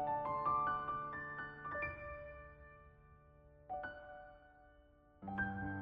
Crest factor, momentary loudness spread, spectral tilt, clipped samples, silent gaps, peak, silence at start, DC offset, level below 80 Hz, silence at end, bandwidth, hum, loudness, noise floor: 16 dB; 23 LU; -5 dB/octave; under 0.1%; none; -28 dBFS; 0 s; under 0.1%; -64 dBFS; 0 s; 5.8 kHz; none; -42 LUFS; -66 dBFS